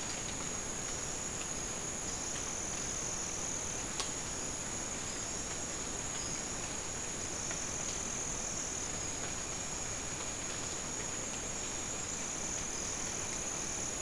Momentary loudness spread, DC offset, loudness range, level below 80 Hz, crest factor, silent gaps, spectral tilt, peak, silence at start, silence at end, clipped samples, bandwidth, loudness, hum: 2 LU; 0.2%; 1 LU; -52 dBFS; 26 dB; none; -1.5 dB/octave; -14 dBFS; 0 s; 0 s; under 0.1%; 12 kHz; -37 LUFS; none